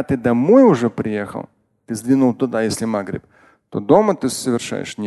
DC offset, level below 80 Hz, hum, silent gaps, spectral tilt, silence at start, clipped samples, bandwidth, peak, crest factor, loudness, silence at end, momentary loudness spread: under 0.1%; -52 dBFS; none; none; -6 dB/octave; 0 s; under 0.1%; 12.5 kHz; 0 dBFS; 18 dB; -17 LUFS; 0 s; 18 LU